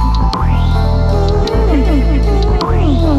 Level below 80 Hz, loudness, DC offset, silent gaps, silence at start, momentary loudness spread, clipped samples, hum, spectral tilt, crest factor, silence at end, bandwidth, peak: -14 dBFS; -13 LUFS; under 0.1%; none; 0 s; 2 LU; under 0.1%; none; -8 dB/octave; 10 dB; 0 s; 7.6 kHz; 0 dBFS